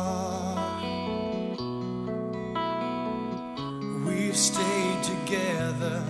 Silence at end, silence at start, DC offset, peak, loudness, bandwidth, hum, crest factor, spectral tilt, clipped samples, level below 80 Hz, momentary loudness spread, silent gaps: 0 s; 0 s; under 0.1%; -12 dBFS; -29 LUFS; 12 kHz; none; 18 dB; -4 dB/octave; under 0.1%; -58 dBFS; 10 LU; none